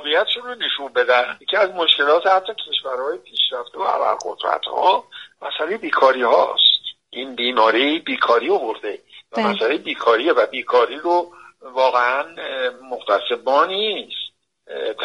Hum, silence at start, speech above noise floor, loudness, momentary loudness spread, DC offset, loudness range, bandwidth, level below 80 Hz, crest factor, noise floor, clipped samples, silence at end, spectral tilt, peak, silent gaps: none; 0 s; 20 dB; -18 LUFS; 14 LU; under 0.1%; 4 LU; 10.5 kHz; -72 dBFS; 20 dB; -39 dBFS; under 0.1%; 0 s; -3 dB/octave; 0 dBFS; none